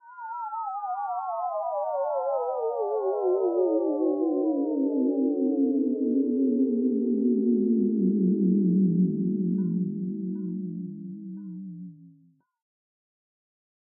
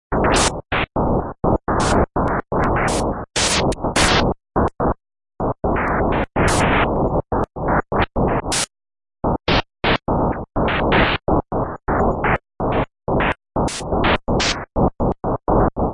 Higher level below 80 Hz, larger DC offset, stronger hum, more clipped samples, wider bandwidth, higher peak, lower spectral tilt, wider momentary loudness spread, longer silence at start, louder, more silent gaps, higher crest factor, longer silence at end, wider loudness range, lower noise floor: second, -84 dBFS vs -28 dBFS; neither; neither; neither; second, 1.6 kHz vs 11.5 kHz; second, -14 dBFS vs -4 dBFS; first, -15 dB/octave vs -4.5 dB/octave; first, 13 LU vs 6 LU; about the same, 0.05 s vs 0.1 s; second, -26 LUFS vs -19 LUFS; neither; about the same, 12 dB vs 16 dB; first, 1.9 s vs 0 s; first, 12 LU vs 2 LU; second, -61 dBFS vs under -90 dBFS